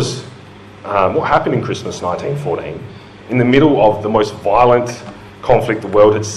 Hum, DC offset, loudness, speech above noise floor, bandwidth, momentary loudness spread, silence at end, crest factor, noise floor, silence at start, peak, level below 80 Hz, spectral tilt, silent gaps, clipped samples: none; under 0.1%; -15 LUFS; 23 dB; 12.5 kHz; 18 LU; 0 s; 14 dB; -37 dBFS; 0 s; 0 dBFS; -42 dBFS; -6 dB/octave; none; under 0.1%